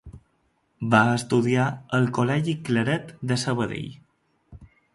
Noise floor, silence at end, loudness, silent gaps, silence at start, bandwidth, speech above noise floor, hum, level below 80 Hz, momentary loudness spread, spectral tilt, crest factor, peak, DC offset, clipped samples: -69 dBFS; 0.3 s; -24 LUFS; none; 0.05 s; 11.5 kHz; 46 dB; none; -56 dBFS; 10 LU; -6 dB/octave; 22 dB; -4 dBFS; under 0.1%; under 0.1%